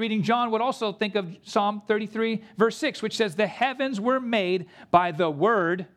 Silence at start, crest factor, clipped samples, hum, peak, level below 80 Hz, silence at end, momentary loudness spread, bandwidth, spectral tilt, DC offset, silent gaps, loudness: 0 s; 20 dB; under 0.1%; none; -4 dBFS; -68 dBFS; 0.1 s; 5 LU; 13.5 kHz; -5.5 dB/octave; under 0.1%; none; -25 LUFS